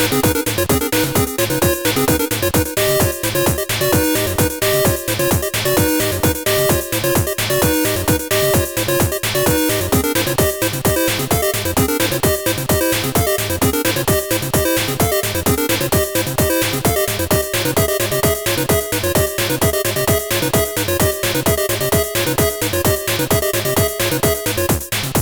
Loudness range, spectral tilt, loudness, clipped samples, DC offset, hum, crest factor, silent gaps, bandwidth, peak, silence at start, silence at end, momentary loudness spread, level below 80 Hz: 1 LU; -4 dB/octave; -16 LUFS; under 0.1%; under 0.1%; none; 12 dB; none; over 20 kHz; -4 dBFS; 0 s; 0 s; 2 LU; -34 dBFS